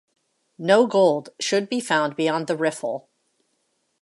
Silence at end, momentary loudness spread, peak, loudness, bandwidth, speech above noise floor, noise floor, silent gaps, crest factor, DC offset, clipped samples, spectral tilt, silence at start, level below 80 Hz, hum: 1.05 s; 12 LU; -4 dBFS; -22 LUFS; 11.5 kHz; 50 dB; -71 dBFS; none; 20 dB; under 0.1%; under 0.1%; -4 dB/octave; 0.6 s; -76 dBFS; none